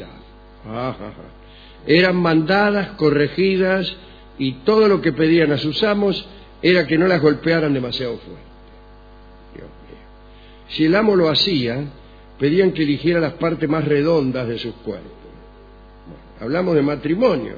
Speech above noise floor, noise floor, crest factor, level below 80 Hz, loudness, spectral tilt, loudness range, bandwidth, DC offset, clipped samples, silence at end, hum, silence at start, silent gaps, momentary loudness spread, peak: 25 dB; -43 dBFS; 18 dB; -46 dBFS; -18 LUFS; -7.5 dB/octave; 6 LU; 5 kHz; under 0.1%; under 0.1%; 0 s; 50 Hz at -45 dBFS; 0 s; none; 14 LU; -2 dBFS